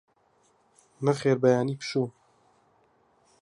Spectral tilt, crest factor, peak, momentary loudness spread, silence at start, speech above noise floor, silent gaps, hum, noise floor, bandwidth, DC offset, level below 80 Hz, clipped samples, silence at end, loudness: -6.5 dB/octave; 20 dB; -8 dBFS; 8 LU; 1 s; 41 dB; none; none; -66 dBFS; 11.5 kHz; under 0.1%; -72 dBFS; under 0.1%; 1.3 s; -26 LUFS